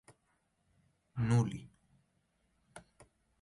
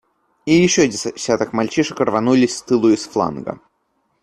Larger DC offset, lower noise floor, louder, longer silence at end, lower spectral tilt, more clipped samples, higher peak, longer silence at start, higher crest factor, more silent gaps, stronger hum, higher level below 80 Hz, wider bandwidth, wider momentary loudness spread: neither; first, -78 dBFS vs -67 dBFS; second, -34 LUFS vs -17 LUFS; about the same, 0.65 s vs 0.65 s; first, -7.5 dB/octave vs -4.5 dB/octave; neither; second, -18 dBFS vs -2 dBFS; first, 1.15 s vs 0.45 s; about the same, 20 dB vs 16 dB; neither; neither; second, -64 dBFS vs -54 dBFS; about the same, 11.5 kHz vs 12 kHz; first, 26 LU vs 13 LU